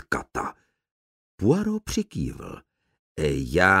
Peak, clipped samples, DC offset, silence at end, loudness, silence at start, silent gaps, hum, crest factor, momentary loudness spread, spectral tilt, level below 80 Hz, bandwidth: -4 dBFS; under 0.1%; under 0.1%; 0 s; -26 LUFS; 0.1 s; 0.91-1.38 s, 2.99-3.16 s; none; 22 dB; 19 LU; -5.5 dB/octave; -44 dBFS; 16 kHz